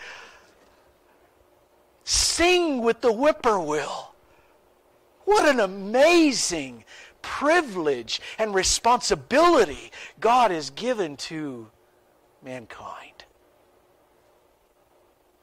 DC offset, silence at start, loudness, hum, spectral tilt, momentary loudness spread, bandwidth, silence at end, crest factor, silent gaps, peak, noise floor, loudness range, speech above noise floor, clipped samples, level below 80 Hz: under 0.1%; 0 s; -22 LUFS; none; -2.5 dB/octave; 21 LU; 16 kHz; 2.35 s; 14 dB; none; -10 dBFS; -62 dBFS; 7 LU; 39 dB; under 0.1%; -50 dBFS